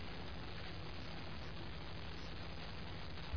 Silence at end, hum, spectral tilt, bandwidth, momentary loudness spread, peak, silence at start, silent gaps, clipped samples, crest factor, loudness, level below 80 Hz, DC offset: 0 s; none; -4 dB/octave; 5.4 kHz; 1 LU; -30 dBFS; 0 s; none; under 0.1%; 16 dB; -49 LUFS; -54 dBFS; 0.4%